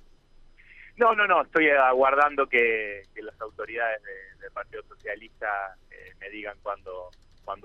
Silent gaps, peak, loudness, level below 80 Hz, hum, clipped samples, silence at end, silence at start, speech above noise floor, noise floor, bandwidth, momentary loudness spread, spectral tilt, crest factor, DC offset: none; -8 dBFS; -24 LUFS; -56 dBFS; none; under 0.1%; 0.1 s; 0.85 s; 28 dB; -54 dBFS; 7.2 kHz; 21 LU; -5.5 dB/octave; 18 dB; under 0.1%